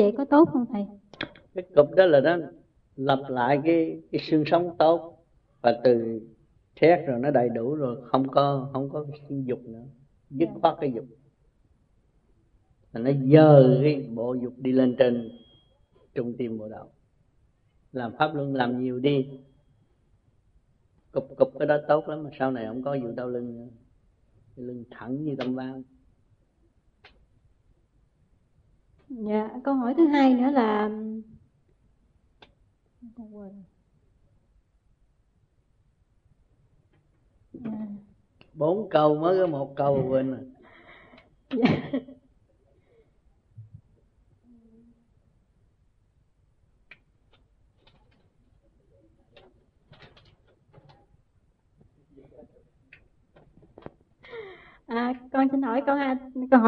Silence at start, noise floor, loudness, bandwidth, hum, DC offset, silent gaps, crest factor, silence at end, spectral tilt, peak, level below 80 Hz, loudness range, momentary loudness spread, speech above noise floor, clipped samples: 0 s; -66 dBFS; -24 LUFS; 5.6 kHz; none; under 0.1%; none; 24 dB; 0 s; -9.5 dB/octave; -4 dBFS; -64 dBFS; 15 LU; 20 LU; 43 dB; under 0.1%